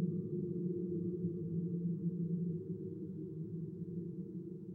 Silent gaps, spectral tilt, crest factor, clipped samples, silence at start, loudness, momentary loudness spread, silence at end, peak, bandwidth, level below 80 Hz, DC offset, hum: none; -14 dB/octave; 14 dB; under 0.1%; 0 s; -41 LUFS; 7 LU; 0 s; -26 dBFS; 1.2 kHz; -72 dBFS; under 0.1%; none